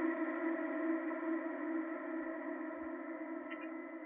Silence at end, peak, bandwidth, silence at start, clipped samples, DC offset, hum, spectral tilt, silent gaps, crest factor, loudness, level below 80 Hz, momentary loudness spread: 0 s; -26 dBFS; 3.7 kHz; 0 s; under 0.1%; under 0.1%; none; -3.5 dB/octave; none; 14 dB; -41 LUFS; -84 dBFS; 7 LU